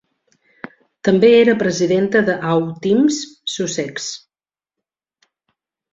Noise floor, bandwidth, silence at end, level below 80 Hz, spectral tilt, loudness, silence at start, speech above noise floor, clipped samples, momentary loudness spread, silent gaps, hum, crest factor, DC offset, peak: under -90 dBFS; 7.8 kHz; 1.75 s; -60 dBFS; -5 dB/octave; -16 LUFS; 1.05 s; over 74 dB; under 0.1%; 23 LU; none; none; 16 dB; under 0.1%; -2 dBFS